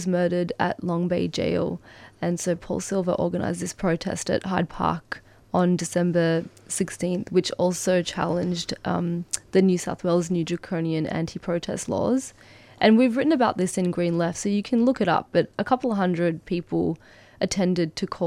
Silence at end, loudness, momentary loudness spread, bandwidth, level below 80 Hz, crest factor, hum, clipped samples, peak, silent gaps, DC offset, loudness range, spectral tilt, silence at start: 0 s; -24 LUFS; 7 LU; 14 kHz; -54 dBFS; 20 dB; none; under 0.1%; -4 dBFS; none; under 0.1%; 4 LU; -5.5 dB/octave; 0 s